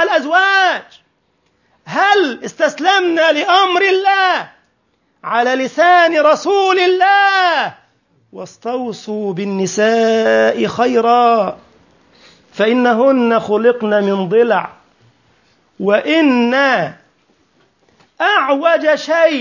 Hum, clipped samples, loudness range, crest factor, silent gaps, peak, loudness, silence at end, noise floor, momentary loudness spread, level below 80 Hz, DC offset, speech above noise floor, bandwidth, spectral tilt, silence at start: none; under 0.1%; 4 LU; 14 dB; none; 0 dBFS; -13 LUFS; 0 s; -62 dBFS; 11 LU; -66 dBFS; under 0.1%; 49 dB; 7.4 kHz; -4 dB/octave; 0 s